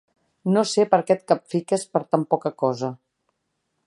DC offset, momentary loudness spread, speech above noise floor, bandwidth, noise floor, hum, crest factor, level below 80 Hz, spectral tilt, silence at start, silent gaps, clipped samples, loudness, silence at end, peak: under 0.1%; 7 LU; 54 dB; 11.5 kHz; -76 dBFS; none; 20 dB; -74 dBFS; -5.5 dB/octave; 0.45 s; none; under 0.1%; -23 LUFS; 0.9 s; -2 dBFS